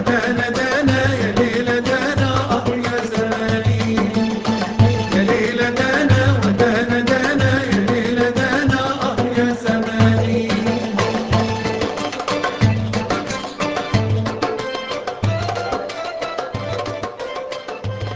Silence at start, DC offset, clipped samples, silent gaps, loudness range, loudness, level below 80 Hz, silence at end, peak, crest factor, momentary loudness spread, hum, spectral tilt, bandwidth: 0 s; under 0.1%; under 0.1%; none; 6 LU; -18 LUFS; -38 dBFS; 0 s; -2 dBFS; 16 dB; 9 LU; none; -6 dB/octave; 8 kHz